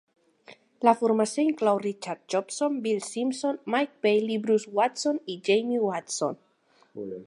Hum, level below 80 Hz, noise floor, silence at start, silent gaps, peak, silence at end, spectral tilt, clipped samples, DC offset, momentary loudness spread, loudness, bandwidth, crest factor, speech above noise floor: none; -80 dBFS; -64 dBFS; 0.5 s; none; -6 dBFS; 0.05 s; -4 dB/octave; under 0.1%; under 0.1%; 8 LU; -26 LUFS; 11.5 kHz; 22 dB; 38 dB